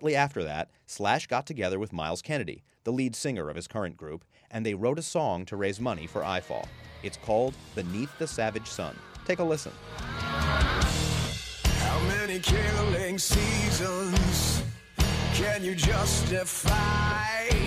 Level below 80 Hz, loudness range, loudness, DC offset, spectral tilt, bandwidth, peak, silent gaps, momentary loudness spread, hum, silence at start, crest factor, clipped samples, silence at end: -36 dBFS; 6 LU; -29 LUFS; under 0.1%; -4.5 dB/octave; 15.5 kHz; -10 dBFS; none; 12 LU; none; 0 s; 18 dB; under 0.1%; 0 s